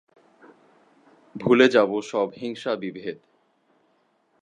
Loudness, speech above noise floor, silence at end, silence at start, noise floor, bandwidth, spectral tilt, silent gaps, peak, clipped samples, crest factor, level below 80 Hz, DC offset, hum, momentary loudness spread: -22 LUFS; 44 dB; 1.3 s; 1.35 s; -66 dBFS; 9.4 kHz; -5.5 dB/octave; none; -2 dBFS; under 0.1%; 24 dB; -70 dBFS; under 0.1%; none; 19 LU